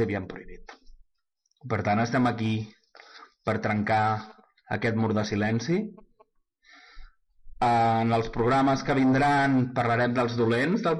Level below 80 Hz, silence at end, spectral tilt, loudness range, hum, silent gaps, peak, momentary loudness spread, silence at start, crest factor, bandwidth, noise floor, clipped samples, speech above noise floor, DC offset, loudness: -52 dBFS; 0 s; -7 dB/octave; 7 LU; none; none; -14 dBFS; 11 LU; 0 s; 12 dB; 11 kHz; -75 dBFS; under 0.1%; 51 dB; under 0.1%; -25 LUFS